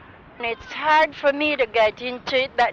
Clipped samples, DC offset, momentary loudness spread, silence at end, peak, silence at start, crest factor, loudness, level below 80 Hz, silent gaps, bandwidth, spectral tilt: under 0.1%; under 0.1%; 11 LU; 0 s; -10 dBFS; 0.4 s; 12 dB; -21 LUFS; -54 dBFS; none; 8 kHz; -4 dB/octave